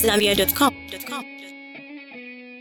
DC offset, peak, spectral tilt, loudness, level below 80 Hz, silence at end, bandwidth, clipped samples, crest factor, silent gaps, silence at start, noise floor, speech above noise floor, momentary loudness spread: under 0.1%; -6 dBFS; -3 dB/octave; -21 LUFS; -48 dBFS; 0 s; 17.5 kHz; under 0.1%; 18 dB; none; 0 s; -40 dBFS; 19 dB; 21 LU